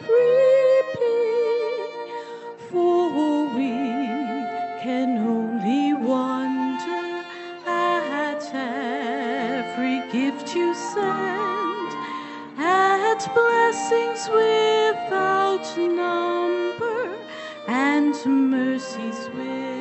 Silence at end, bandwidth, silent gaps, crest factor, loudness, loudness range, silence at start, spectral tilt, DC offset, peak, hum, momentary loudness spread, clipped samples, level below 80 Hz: 0 s; 8.2 kHz; none; 16 dB; -22 LUFS; 5 LU; 0 s; -4.5 dB/octave; under 0.1%; -6 dBFS; none; 12 LU; under 0.1%; -74 dBFS